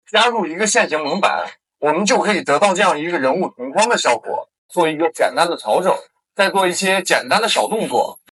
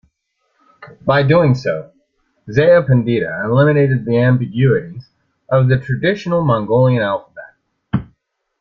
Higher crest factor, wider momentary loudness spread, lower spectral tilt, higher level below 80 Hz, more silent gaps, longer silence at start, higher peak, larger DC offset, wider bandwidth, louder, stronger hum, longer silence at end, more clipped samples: about the same, 18 dB vs 14 dB; second, 7 LU vs 11 LU; second, -2.5 dB/octave vs -9 dB/octave; second, -80 dBFS vs -48 dBFS; first, 4.58-4.69 s vs none; second, 0.15 s vs 0.8 s; about the same, 0 dBFS vs -2 dBFS; neither; first, 13.5 kHz vs 6.4 kHz; about the same, -17 LUFS vs -15 LUFS; neither; second, 0.2 s vs 0.55 s; neither